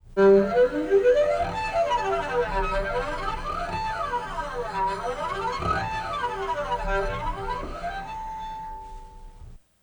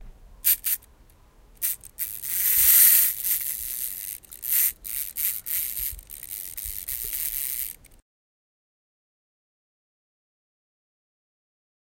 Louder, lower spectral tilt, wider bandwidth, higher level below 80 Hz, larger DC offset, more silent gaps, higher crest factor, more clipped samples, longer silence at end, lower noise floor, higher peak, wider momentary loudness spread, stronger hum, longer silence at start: second, -26 LUFS vs -22 LUFS; first, -5.5 dB/octave vs 2 dB/octave; first, over 20 kHz vs 17.5 kHz; first, -38 dBFS vs -52 dBFS; neither; neither; second, 18 dB vs 26 dB; neither; second, 0.25 s vs 4.25 s; second, -46 dBFS vs -54 dBFS; second, -8 dBFS vs -2 dBFS; second, 14 LU vs 18 LU; neither; about the same, 0.05 s vs 0 s